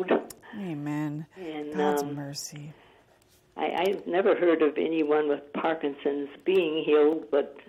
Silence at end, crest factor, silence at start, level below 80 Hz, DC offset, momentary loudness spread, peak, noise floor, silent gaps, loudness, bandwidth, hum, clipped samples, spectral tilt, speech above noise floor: 0.1 s; 16 dB; 0 s; -72 dBFS; under 0.1%; 15 LU; -10 dBFS; -62 dBFS; none; -27 LUFS; 15 kHz; none; under 0.1%; -5.5 dB/octave; 35 dB